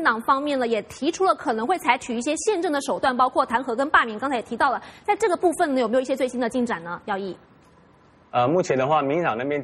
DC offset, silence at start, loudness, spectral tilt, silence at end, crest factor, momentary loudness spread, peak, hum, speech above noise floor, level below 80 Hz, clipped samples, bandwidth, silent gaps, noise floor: under 0.1%; 0 s; -23 LUFS; -4.5 dB/octave; 0 s; 20 dB; 7 LU; -2 dBFS; none; 32 dB; -60 dBFS; under 0.1%; 12.5 kHz; none; -54 dBFS